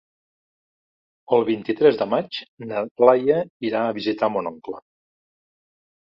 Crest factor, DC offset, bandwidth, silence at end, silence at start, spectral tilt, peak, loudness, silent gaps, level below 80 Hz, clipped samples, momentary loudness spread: 22 dB; under 0.1%; 6 kHz; 1.25 s; 1.3 s; -8 dB/octave; 0 dBFS; -21 LUFS; 2.48-2.57 s, 2.91-2.95 s, 3.50-3.60 s; -68 dBFS; under 0.1%; 15 LU